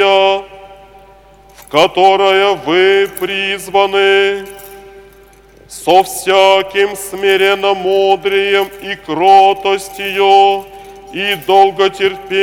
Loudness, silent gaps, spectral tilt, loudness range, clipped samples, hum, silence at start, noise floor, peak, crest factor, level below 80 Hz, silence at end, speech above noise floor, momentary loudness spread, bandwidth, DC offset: -11 LUFS; none; -3 dB/octave; 3 LU; 0.2%; none; 0 s; -42 dBFS; 0 dBFS; 12 dB; -48 dBFS; 0 s; 31 dB; 11 LU; 17 kHz; under 0.1%